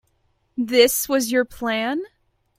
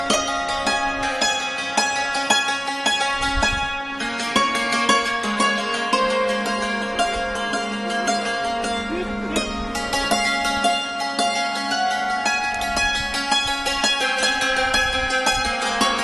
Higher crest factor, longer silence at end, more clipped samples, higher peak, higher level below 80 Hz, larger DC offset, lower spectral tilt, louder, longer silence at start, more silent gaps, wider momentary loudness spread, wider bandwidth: about the same, 20 dB vs 18 dB; first, 0.55 s vs 0 s; neither; about the same, -2 dBFS vs -4 dBFS; second, -56 dBFS vs -40 dBFS; neither; about the same, -2 dB/octave vs -2 dB/octave; about the same, -20 LUFS vs -21 LUFS; first, 0.55 s vs 0 s; neither; first, 14 LU vs 5 LU; first, 16.5 kHz vs 13 kHz